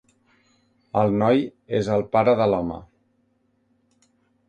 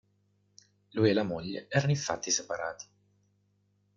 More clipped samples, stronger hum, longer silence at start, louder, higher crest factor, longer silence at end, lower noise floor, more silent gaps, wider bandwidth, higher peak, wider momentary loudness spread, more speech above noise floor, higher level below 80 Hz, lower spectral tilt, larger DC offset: neither; second, none vs 50 Hz at -50 dBFS; about the same, 0.95 s vs 0.95 s; first, -22 LUFS vs -30 LUFS; about the same, 18 dB vs 22 dB; first, 1.65 s vs 1.15 s; second, -67 dBFS vs -72 dBFS; neither; first, 9.2 kHz vs 7.6 kHz; first, -6 dBFS vs -12 dBFS; second, 9 LU vs 13 LU; first, 46 dB vs 42 dB; first, -54 dBFS vs -68 dBFS; first, -8 dB/octave vs -4.5 dB/octave; neither